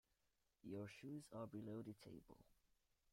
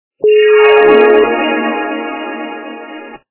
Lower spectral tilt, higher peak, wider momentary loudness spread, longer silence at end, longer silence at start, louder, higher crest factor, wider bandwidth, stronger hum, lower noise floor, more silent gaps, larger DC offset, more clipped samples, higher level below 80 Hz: about the same, -7 dB/octave vs -7.5 dB/octave; second, -42 dBFS vs 0 dBFS; second, 9 LU vs 21 LU; first, 0.6 s vs 0.15 s; first, 0.65 s vs 0.25 s; second, -56 LUFS vs -9 LUFS; about the same, 16 dB vs 12 dB; first, 16 kHz vs 4 kHz; neither; first, -87 dBFS vs -30 dBFS; neither; neither; second, under 0.1% vs 0.4%; second, -82 dBFS vs -52 dBFS